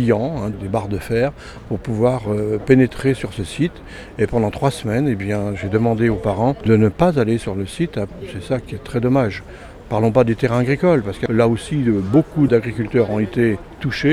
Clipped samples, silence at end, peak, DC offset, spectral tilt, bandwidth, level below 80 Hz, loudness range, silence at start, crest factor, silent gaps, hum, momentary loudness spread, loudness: under 0.1%; 0 s; 0 dBFS; under 0.1%; -7.5 dB/octave; 13 kHz; -40 dBFS; 3 LU; 0 s; 18 dB; none; none; 10 LU; -19 LUFS